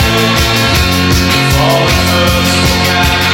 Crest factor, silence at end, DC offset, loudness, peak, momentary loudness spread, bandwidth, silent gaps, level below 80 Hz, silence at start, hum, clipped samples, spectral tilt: 10 dB; 0 s; under 0.1%; -9 LUFS; 0 dBFS; 0 LU; 17 kHz; none; -20 dBFS; 0 s; none; under 0.1%; -4 dB/octave